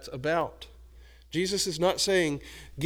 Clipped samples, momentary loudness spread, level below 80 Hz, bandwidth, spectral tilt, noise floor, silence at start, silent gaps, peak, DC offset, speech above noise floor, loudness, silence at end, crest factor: under 0.1%; 19 LU; -52 dBFS; over 20 kHz; -3.5 dB/octave; -52 dBFS; 0 s; none; -12 dBFS; under 0.1%; 23 dB; -28 LUFS; 0 s; 18 dB